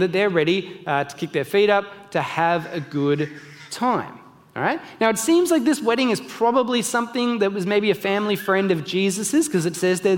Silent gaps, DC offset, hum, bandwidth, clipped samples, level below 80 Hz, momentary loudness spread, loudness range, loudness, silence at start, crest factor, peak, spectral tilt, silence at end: none; under 0.1%; none; 17 kHz; under 0.1%; -68 dBFS; 8 LU; 3 LU; -21 LUFS; 0 s; 18 dB; -4 dBFS; -4.5 dB/octave; 0 s